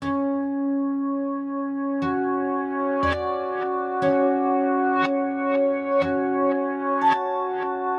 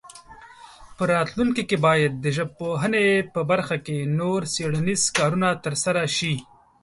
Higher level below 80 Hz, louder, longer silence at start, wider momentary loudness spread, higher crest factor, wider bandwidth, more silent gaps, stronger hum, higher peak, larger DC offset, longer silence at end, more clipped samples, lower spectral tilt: about the same, -54 dBFS vs -56 dBFS; about the same, -24 LUFS vs -23 LUFS; about the same, 0 s vs 0.05 s; about the same, 6 LU vs 7 LU; about the same, 14 dB vs 18 dB; second, 6.6 kHz vs 11.5 kHz; neither; neither; second, -10 dBFS vs -6 dBFS; neither; second, 0 s vs 0.4 s; neither; first, -7.5 dB/octave vs -4.5 dB/octave